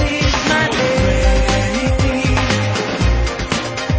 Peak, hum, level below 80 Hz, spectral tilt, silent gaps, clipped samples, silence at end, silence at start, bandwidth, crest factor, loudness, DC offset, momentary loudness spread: -2 dBFS; none; -20 dBFS; -5 dB/octave; none; under 0.1%; 0 s; 0 s; 8 kHz; 14 dB; -16 LUFS; under 0.1%; 4 LU